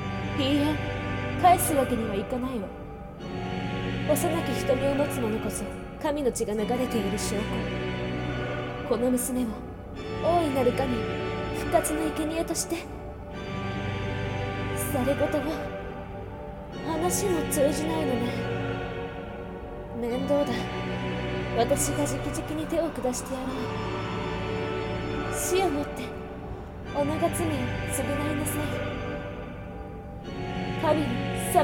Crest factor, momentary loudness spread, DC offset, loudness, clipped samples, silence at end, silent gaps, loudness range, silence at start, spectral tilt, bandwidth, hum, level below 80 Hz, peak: 20 dB; 13 LU; under 0.1%; -28 LUFS; under 0.1%; 0 s; none; 3 LU; 0 s; -5 dB/octave; 18 kHz; none; -42 dBFS; -8 dBFS